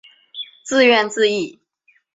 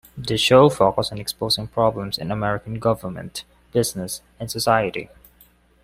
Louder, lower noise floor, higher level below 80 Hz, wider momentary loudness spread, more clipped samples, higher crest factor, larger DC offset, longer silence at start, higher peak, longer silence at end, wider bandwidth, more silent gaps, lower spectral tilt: first, -16 LUFS vs -21 LUFS; first, -61 dBFS vs -55 dBFS; second, -66 dBFS vs -50 dBFS; first, 19 LU vs 16 LU; neither; about the same, 18 dB vs 20 dB; neither; first, 0.35 s vs 0.15 s; about the same, -2 dBFS vs -2 dBFS; second, 0.65 s vs 0.8 s; second, 7.8 kHz vs 16 kHz; neither; second, -2.5 dB/octave vs -4.5 dB/octave